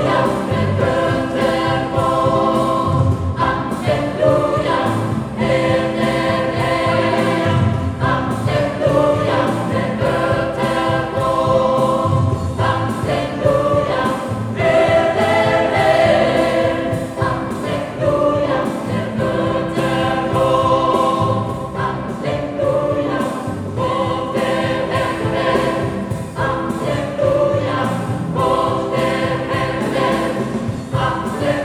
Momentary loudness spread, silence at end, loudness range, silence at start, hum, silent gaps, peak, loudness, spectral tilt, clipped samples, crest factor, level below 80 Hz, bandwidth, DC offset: 7 LU; 0 s; 4 LU; 0 s; none; none; -2 dBFS; -17 LUFS; -6.5 dB/octave; under 0.1%; 16 dB; -40 dBFS; 14 kHz; under 0.1%